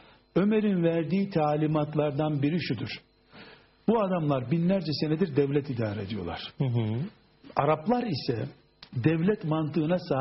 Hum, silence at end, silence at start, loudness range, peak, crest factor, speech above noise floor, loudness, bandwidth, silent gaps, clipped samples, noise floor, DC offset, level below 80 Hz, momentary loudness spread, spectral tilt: none; 0 s; 0.35 s; 2 LU; -8 dBFS; 18 dB; 25 dB; -28 LUFS; 5.8 kHz; none; under 0.1%; -52 dBFS; under 0.1%; -60 dBFS; 9 LU; -6.5 dB/octave